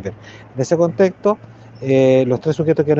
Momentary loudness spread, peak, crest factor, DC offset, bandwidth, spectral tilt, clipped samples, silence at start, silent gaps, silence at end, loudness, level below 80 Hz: 15 LU; -2 dBFS; 14 dB; under 0.1%; 7.8 kHz; -7.5 dB/octave; under 0.1%; 0 s; none; 0 s; -16 LUFS; -56 dBFS